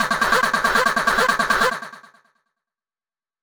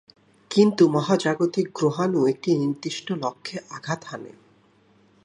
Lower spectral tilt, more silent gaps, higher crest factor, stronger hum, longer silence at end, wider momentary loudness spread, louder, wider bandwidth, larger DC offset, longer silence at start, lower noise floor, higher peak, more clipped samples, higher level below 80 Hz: second, -2 dB/octave vs -6 dB/octave; neither; about the same, 18 dB vs 20 dB; neither; first, 1.45 s vs 0.95 s; second, 6 LU vs 15 LU; first, -18 LUFS vs -23 LUFS; first, over 20 kHz vs 11 kHz; neither; second, 0 s vs 0.5 s; first, under -90 dBFS vs -59 dBFS; about the same, -4 dBFS vs -4 dBFS; neither; first, -48 dBFS vs -72 dBFS